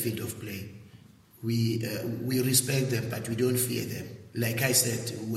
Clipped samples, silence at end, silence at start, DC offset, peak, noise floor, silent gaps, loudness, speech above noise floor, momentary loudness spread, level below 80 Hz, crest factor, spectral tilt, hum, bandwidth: under 0.1%; 0 s; 0 s; under 0.1%; -10 dBFS; -54 dBFS; none; -28 LUFS; 25 dB; 15 LU; -64 dBFS; 20 dB; -4 dB/octave; none; 16 kHz